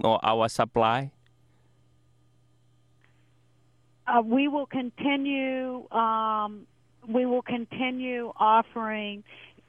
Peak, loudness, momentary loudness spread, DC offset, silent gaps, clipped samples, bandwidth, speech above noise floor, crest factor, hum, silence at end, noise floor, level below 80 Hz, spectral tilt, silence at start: -8 dBFS; -27 LUFS; 11 LU; under 0.1%; none; under 0.1%; 11.5 kHz; 38 dB; 20 dB; none; 0.25 s; -64 dBFS; -66 dBFS; -5.5 dB/octave; 0 s